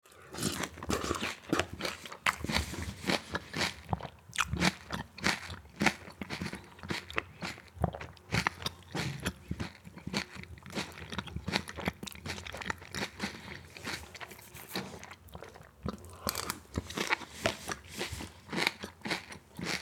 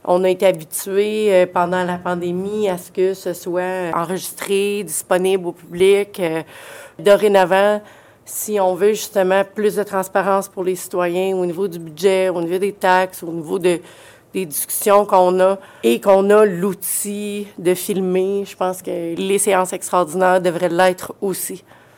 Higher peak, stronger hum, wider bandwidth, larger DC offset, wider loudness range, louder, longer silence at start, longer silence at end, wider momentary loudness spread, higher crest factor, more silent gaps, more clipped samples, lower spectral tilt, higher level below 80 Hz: second, -6 dBFS vs -2 dBFS; neither; first, 19.5 kHz vs 17 kHz; neither; first, 7 LU vs 4 LU; second, -36 LUFS vs -18 LUFS; about the same, 0.05 s vs 0.05 s; second, 0 s vs 0.4 s; about the same, 13 LU vs 11 LU; first, 32 dB vs 16 dB; neither; neither; about the same, -3.5 dB/octave vs -4.5 dB/octave; first, -54 dBFS vs -62 dBFS